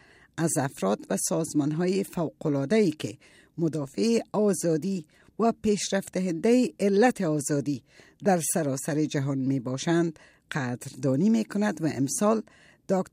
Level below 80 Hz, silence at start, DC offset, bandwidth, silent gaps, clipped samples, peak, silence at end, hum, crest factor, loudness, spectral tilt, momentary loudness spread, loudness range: -66 dBFS; 0.35 s; under 0.1%; 16 kHz; none; under 0.1%; -10 dBFS; 0.05 s; none; 16 dB; -27 LUFS; -5.5 dB/octave; 8 LU; 2 LU